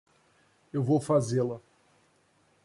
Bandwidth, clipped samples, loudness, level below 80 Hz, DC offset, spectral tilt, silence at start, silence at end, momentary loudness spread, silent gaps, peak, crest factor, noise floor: 11.5 kHz; under 0.1%; -28 LUFS; -68 dBFS; under 0.1%; -7.5 dB/octave; 0.75 s; 1.05 s; 11 LU; none; -14 dBFS; 18 dB; -67 dBFS